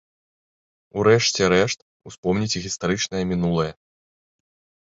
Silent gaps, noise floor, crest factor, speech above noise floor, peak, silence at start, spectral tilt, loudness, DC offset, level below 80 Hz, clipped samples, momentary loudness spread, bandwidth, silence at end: 1.82-2.00 s, 2.18-2.23 s; under -90 dBFS; 20 dB; over 69 dB; -4 dBFS; 0.95 s; -4.5 dB/octave; -21 LUFS; under 0.1%; -50 dBFS; under 0.1%; 12 LU; 8 kHz; 1.15 s